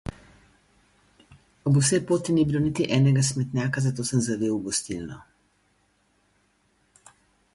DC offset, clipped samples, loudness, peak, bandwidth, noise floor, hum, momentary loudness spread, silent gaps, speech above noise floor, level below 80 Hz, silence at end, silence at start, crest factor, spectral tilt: under 0.1%; under 0.1%; -24 LUFS; -10 dBFS; 11.5 kHz; -67 dBFS; 50 Hz at -60 dBFS; 14 LU; none; 44 dB; -54 dBFS; 2.35 s; 0.05 s; 18 dB; -5.5 dB/octave